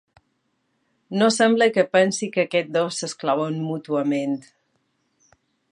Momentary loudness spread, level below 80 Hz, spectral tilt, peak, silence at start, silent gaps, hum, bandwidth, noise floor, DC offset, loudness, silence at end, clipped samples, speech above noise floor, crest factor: 10 LU; -76 dBFS; -4.5 dB/octave; -4 dBFS; 1.1 s; none; none; 11.5 kHz; -71 dBFS; under 0.1%; -21 LUFS; 1.3 s; under 0.1%; 50 dB; 20 dB